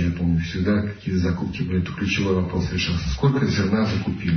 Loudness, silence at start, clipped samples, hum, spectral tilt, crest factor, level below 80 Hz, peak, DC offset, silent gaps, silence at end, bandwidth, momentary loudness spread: -23 LUFS; 0 s; under 0.1%; none; -6.5 dB/octave; 14 dB; -38 dBFS; -8 dBFS; under 0.1%; none; 0 s; 6.6 kHz; 4 LU